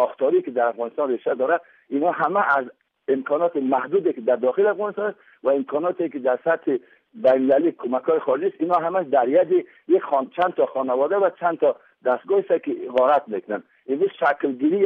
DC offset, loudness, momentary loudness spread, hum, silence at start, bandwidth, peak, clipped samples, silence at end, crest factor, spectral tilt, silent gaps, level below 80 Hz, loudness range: under 0.1%; -22 LUFS; 7 LU; none; 0 s; 4.5 kHz; -8 dBFS; under 0.1%; 0 s; 14 dB; -8.5 dB/octave; none; -74 dBFS; 2 LU